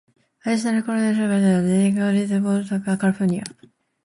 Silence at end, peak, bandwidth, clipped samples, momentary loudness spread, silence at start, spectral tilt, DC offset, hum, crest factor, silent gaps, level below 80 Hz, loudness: 0.55 s; -8 dBFS; 11.5 kHz; under 0.1%; 6 LU; 0.45 s; -6.5 dB/octave; under 0.1%; none; 12 dB; none; -60 dBFS; -21 LUFS